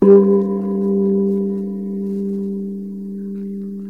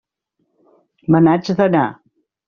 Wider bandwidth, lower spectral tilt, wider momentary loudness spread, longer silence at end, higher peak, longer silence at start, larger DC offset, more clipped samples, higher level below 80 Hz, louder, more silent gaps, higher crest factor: second, 2.6 kHz vs 6.8 kHz; first, -12 dB/octave vs -7 dB/octave; first, 13 LU vs 10 LU; second, 0 s vs 0.55 s; about the same, 0 dBFS vs -2 dBFS; second, 0 s vs 1.1 s; first, 0.3% vs under 0.1%; neither; about the same, -60 dBFS vs -56 dBFS; second, -19 LUFS vs -15 LUFS; neither; about the same, 16 dB vs 16 dB